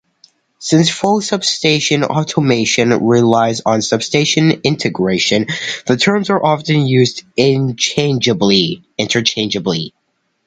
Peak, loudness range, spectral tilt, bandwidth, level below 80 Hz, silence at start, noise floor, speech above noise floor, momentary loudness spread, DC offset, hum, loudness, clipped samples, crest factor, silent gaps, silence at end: 0 dBFS; 1 LU; -4.5 dB/octave; 9.4 kHz; -52 dBFS; 0.6 s; -66 dBFS; 52 dB; 5 LU; under 0.1%; none; -14 LUFS; under 0.1%; 14 dB; none; 0.6 s